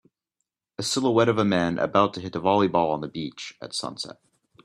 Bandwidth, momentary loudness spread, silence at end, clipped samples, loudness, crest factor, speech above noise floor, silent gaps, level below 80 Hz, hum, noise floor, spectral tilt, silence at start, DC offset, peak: 13 kHz; 14 LU; 0.55 s; under 0.1%; -24 LUFS; 20 dB; 58 dB; none; -64 dBFS; none; -82 dBFS; -5 dB/octave; 0.8 s; under 0.1%; -6 dBFS